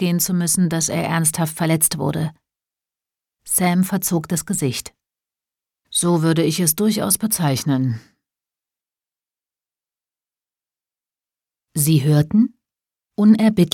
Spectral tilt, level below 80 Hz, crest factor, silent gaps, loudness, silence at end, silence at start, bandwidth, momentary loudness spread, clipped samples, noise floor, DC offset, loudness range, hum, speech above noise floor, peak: -5 dB/octave; -56 dBFS; 18 dB; none; -18 LUFS; 0.05 s; 0 s; 18.5 kHz; 8 LU; under 0.1%; under -90 dBFS; under 0.1%; 6 LU; none; over 72 dB; -2 dBFS